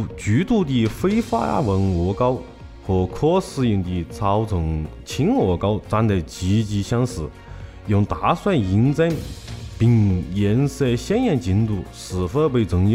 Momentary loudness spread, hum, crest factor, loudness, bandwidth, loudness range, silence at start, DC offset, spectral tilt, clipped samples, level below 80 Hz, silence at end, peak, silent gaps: 10 LU; none; 14 dB; -21 LUFS; 15 kHz; 2 LU; 0 s; under 0.1%; -7.5 dB/octave; under 0.1%; -38 dBFS; 0 s; -6 dBFS; none